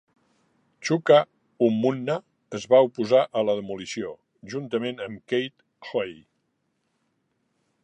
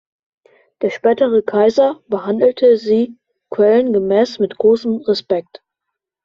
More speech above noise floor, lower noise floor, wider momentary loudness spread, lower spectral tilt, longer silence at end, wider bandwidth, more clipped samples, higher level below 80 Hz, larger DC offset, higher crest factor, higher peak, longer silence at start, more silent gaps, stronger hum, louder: second, 51 dB vs 65 dB; second, -74 dBFS vs -80 dBFS; first, 17 LU vs 9 LU; about the same, -5.5 dB/octave vs -6.5 dB/octave; first, 1.7 s vs 0.85 s; first, 9 kHz vs 7.2 kHz; neither; second, -72 dBFS vs -60 dBFS; neither; first, 20 dB vs 14 dB; second, -6 dBFS vs -2 dBFS; about the same, 0.8 s vs 0.8 s; neither; neither; second, -24 LUFS vs -15 LUFS